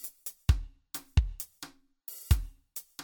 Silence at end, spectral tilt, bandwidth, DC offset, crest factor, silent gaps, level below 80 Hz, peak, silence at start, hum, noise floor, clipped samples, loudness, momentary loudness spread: 0 s; -4.5 dB/octave; over 20 kHz; under 0.1%; 22 dB; none; -34 dBFS; -10 dBFS; 0 s; none; -52 dBFS; under 0.1%; -34 LUFS; 15 LU